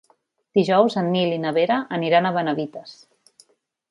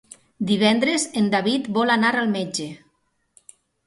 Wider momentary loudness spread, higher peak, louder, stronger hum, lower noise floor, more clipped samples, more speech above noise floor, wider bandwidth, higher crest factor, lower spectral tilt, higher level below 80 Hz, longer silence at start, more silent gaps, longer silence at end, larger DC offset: about the same, 9 LU vs 11 LU; first, -2 dBFS vs -6 dBFS; about the same, -21 LUFS vs -21 LUFS; neither; second, -64 dBFS vs -68 dBFS; neither; second, 43 dB vs 48 dB; about the same, 11.5 kHz vs 11.5 kHz; about the same, 20 dB vs 18 dB; first, -7 dB/octave vs -4 dB/octave; about the same, -70 dBFS vs -66 dBFS; first, 0.55 s vs 0.4 s; neither; about the same, 1 s vs 1.1 s; neither